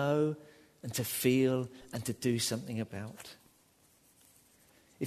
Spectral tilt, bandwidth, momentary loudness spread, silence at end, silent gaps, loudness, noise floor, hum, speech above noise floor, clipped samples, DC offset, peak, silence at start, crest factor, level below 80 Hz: -5 dB/octave; 13.5 kHz; 17 LU; 0 s; none; -33 LUFS; -67 dBFS; none; 34 dB; under 0.1%; under 0.1%; -14 dBFS; 0 s; 20 dB; -70 dBFS